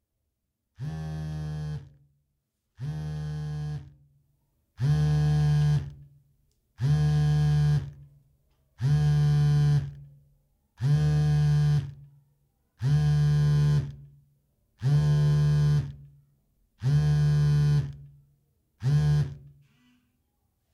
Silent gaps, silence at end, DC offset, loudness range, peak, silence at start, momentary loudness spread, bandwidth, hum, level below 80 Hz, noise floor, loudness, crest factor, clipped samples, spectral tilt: none; 1.25 s; under 0.1%; 11 LU; -14 dBFS; 0.8 s; 14 LU; 7 kHz; none; -44 dBFS; -80 dBFS; -26 LUFS; 12 dB; under 0.1%; -8 dB/octave